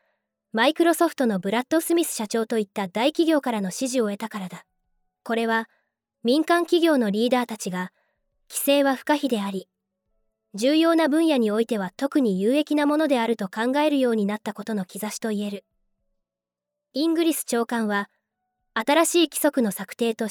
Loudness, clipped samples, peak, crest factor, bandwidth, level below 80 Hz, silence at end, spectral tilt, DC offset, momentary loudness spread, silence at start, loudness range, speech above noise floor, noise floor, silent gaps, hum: -23 LUFS; under 0.1%; -6 dBFS; 18 dB; 19 kHz; -76 dBFS; 0 s; -4 dB/octave; under 0.1%; 11 LU; 0.55 s; 5 LU; 66 dB; -88 dBFS; none; none